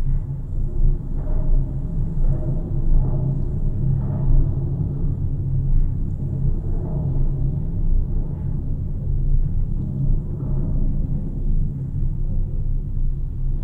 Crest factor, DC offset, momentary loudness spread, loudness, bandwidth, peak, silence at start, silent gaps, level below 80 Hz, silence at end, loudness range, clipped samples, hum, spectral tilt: 14 dB; under 0.1%; 5 LU; -25 LUFS; 1.4 kHz; -6 dBFS; 0 s; none; -20 dBFS; 0 s; 2 LU; under 0.1%; none; -12.5 dB/octave